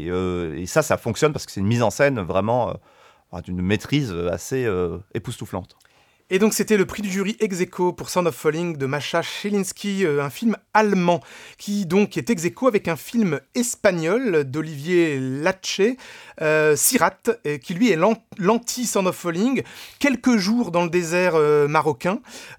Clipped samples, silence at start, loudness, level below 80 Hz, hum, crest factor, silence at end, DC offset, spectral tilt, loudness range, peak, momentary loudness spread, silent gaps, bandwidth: under 0.1%; 0 s; -21 LUFS; -54 dBFS; none; 20 dB; 0.05 s; under 0.1%; -5 dB/octave; 4 LU; -2 dBFS; 9 LU; none; 19 kHz